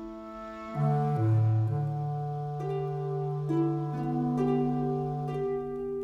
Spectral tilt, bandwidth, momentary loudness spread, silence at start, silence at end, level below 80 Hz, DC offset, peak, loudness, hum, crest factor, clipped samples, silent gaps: -10.5 dB/octave; 6 kHz; 8 LU; 0 s; 0 s; -58 dBFS; under 0.1%; -16 dBFS; -30 LUFS; none; 14 dB; under 0.1%; none